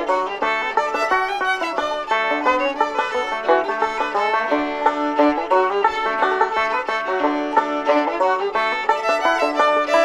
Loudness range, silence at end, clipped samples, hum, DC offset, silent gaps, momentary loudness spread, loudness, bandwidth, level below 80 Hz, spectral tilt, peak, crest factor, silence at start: 1 LU; 0 s; under 0.1%; none; under 0.1%; none; 4 LU; -19 LUFS; 13 kHz; -54 dBFS; -2.5 dB/octave; -2 dBFS; 16 dB; 0 s